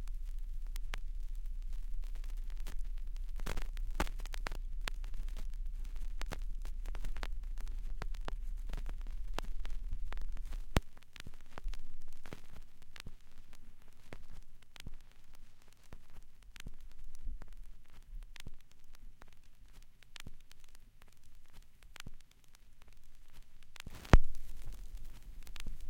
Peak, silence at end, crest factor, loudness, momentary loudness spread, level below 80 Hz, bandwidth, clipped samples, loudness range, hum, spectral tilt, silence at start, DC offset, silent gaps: -8 dBFS; 0 s; 28 dB; -45 LUFS; 19 LU; -40 dBFS; 11 kHz; under 0.1%; 18 LU; none; -5.5 dB/octave; 0 s; under 0.1%; none